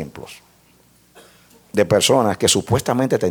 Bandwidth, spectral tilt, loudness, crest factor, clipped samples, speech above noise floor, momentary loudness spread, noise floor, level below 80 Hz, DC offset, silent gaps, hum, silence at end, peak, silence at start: 19 kHz; -4 dB/octave; -17 LUFS; 18 dB; under 0.1%; 36 dB; 20 LU; -54 dBFS; -50 dBFS; under 0.1%; none; none; 0 s; -2 dBFS; 0 s